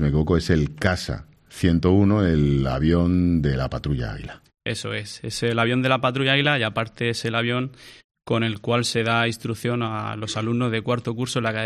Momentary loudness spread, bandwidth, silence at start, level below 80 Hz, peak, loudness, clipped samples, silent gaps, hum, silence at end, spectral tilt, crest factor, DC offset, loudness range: 11 LU; 13.5 kHz; 0 s; -40 dBFS; -6 dBFS; -22 LUFS; under 0.1%; 8.04-8.09 s; none; 0 s; -6 dB/octave; 16 dB; under 0.1%; 3 LU